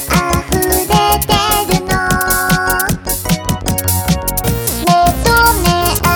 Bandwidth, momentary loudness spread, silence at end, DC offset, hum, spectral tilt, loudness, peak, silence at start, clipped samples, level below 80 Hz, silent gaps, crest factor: over 20 kHz; 5 LU; 0 s; under 0.1%; none; -4 dB/octave; -13 LUFS; 0 dBFS; 0 s; under 0.1%; -24 dBFS; none; 14 dB